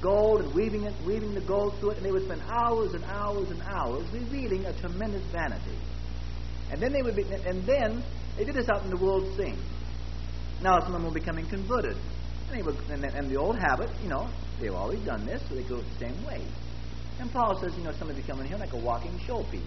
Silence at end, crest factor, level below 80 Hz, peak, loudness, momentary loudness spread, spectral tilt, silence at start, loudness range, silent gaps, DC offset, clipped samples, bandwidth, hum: 0 s; 20 dB; -38 dBFS; -10 dBFS; -31 LUFS; 12 LU; -7 dB/octave; 0 s; 4 LU; none; 1%; under 0.1%; 6.2 kHz; none